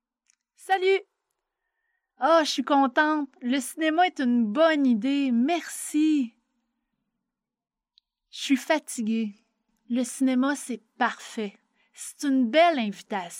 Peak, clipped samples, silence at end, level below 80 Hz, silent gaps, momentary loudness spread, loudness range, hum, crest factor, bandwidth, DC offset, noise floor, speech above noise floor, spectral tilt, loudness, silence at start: -8 dBFS; under 0.1%; 0 s; -86 dBFS; none; 13 LU; 7 LU; none; 18 dB; 16 kHz; under 0.1%; -90 dBFS; 65 dB; -3.5 dB/octave; -25 LUFS; 0.65 s